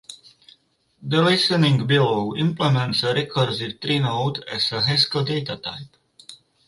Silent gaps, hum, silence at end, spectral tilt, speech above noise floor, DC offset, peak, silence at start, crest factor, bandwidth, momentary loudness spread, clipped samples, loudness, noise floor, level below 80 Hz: none; none; 0.3 s; -5.5 dB/octave; 38 dB; under 0.1%; -4 dBFS; 0.1 s; 18 dB; 11.5 kHz; 12 LU; under 0.1%; -21 LUFS; -59 dBFS; -58 dBFS